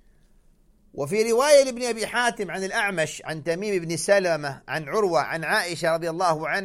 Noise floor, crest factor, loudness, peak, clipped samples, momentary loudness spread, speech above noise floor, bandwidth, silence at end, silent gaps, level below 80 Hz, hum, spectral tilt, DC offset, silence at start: -58 dBFS; 18 dB; -23 LUFS; -6 dBFS; under 0.1%; 11 LU; 34 dB; 15.5 kHz; 0 s; none; -58 dBFS; none; -3.5 dB/octave; under 0.1%; 0.95 s